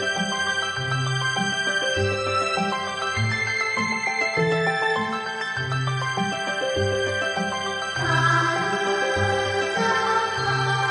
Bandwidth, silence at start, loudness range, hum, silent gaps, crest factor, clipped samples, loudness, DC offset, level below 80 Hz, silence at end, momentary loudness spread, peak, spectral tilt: 10 kHz; 0 s; 2 LU; none; none; 16 dB; under 0.1%; -23 LUFS; under 0.1%; -56 dBFS; 0 s; 5 LU; -8 dBFS; -4 dB/octave